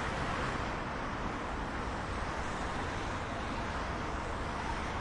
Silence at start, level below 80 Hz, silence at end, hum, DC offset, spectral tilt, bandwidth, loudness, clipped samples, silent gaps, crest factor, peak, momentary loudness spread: 0 s; -44 dBFS; 0 s; none; under 0.1%; -5 dB/octave; 11 kHz; -37 LUFS; under 0.1%; none; 14 dB; -22 dBFS; 3 LU